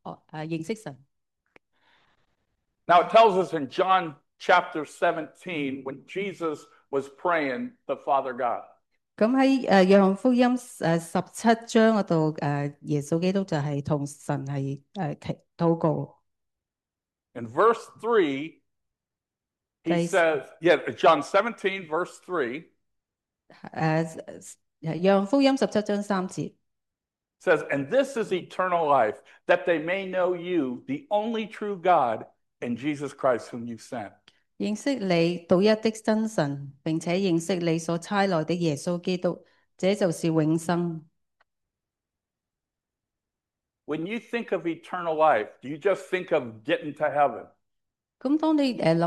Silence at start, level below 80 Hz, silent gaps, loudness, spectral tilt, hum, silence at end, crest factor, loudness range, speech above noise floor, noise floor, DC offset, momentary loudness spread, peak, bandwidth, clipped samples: 0.05 s; -72 dBFS; none; -25 LUFS; -6 dB/octave; none; 0 s; 20 dB; 7 LU; over 65 dB; under -90 dBFS; under 0.1%; 14 LU; -6 dBFS; 12.5 kHz; under 0.1%